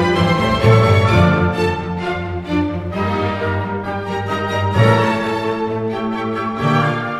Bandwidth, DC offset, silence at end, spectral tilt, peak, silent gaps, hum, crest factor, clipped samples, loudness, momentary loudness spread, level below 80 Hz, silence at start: 12 kHz; under 0.1%; 0 s; -7 dB/octave; 0 dBFS; none; none; 16 dB; under 0.1%; -17 LUFS; 9 LU; -42 dBFS; 0 s